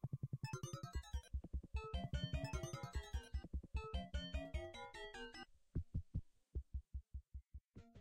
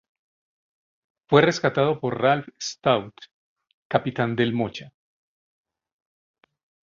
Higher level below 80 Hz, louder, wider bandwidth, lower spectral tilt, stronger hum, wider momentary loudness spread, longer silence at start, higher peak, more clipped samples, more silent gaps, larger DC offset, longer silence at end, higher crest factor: first, -50 dBFS vs -62 dBFS; second, -49 LUFS vs -23 LUFS; first, 15.5 kHz vs 7.6 kHz; about the same, -5.5 dB/octave vs -5.5 dB/octave; neither; about the same, 10 LU vs 11 LU; second, 0.05 s vs 1.3 s; second, -32 dBFS vs -2 dBFS; neither; second, none vs 3.31-3.56 s, 3.74-3.90 s; neither; second, 0 s vs 2.05 s; second, 16 dB vs 24 dB